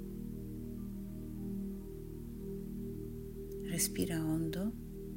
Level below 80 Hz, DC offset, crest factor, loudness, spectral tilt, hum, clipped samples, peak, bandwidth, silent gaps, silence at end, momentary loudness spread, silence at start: -50 dBFS; under 0.1%; 20 dB; -40 LUFS; -5 dB/octave; none; under 0.1%; -20 dBFS; 16 kHz; none; 0 s; 12 LU; 0 s